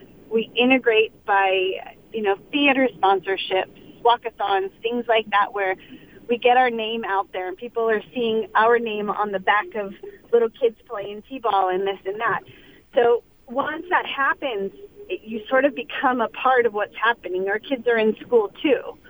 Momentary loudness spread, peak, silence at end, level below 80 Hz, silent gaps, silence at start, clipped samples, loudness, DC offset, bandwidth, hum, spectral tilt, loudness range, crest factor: 12 LU; -4 dBFS; 0.15 s; -60 dBFS; none; 0.3 s; under 0.1%; -22 LUFS; under 0.1%; over 20 kHz; none; -6 dB/octave; 3 LU; 18 dB